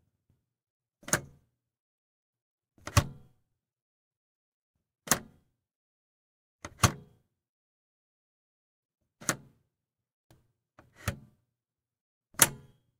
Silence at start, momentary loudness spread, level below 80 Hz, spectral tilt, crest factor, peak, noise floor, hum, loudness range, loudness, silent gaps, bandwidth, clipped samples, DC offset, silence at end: 1.1 s; 25 LU; -54 dBFS; -2.5 dB/octave; 36 dB; -2 dBFS; under -90 dBFS; none; 8 LU; -30 LUFS; 1.80-2.33 s, 2.42-2.58 s, 3.82-4.11 s, 4.17-4.74 s, 5.76-6.59 s, 7.49-8.89 s, 10.13-10.30 s, 12.01-12.21 s; 16 kHz; under 0.1%; under 0.1%; 0.45 s